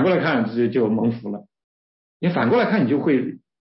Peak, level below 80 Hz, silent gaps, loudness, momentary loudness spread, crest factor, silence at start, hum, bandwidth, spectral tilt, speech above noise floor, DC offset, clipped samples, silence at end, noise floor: -8 dBFS; -64 dBFS; 1.64-2.20 s; -20 LUFS; 12 LU; 14 dB; 0 s; none; 5.8 kHz; -11.5 dB/octave; over 70 dB; under 0.1%; under 0.1%; 0.25 s; under -90 dBFS